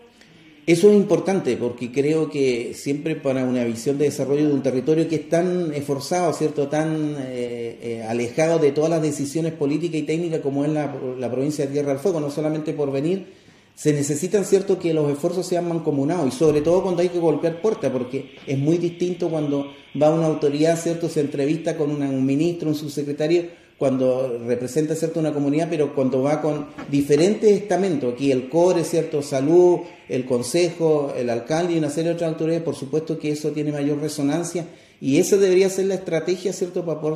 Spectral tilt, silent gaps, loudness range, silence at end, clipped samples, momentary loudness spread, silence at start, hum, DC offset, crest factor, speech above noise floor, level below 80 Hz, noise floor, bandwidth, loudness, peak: -6 dB/octave; none; 4 LU; 0 s; under 0.1%; 8 LU; 0.65 s; none; under 0.1%; 18 dB; 28 dB; -62 dBFS; -49 dBFS; 14.5 kHz; -22 LUFS; -4 dBFS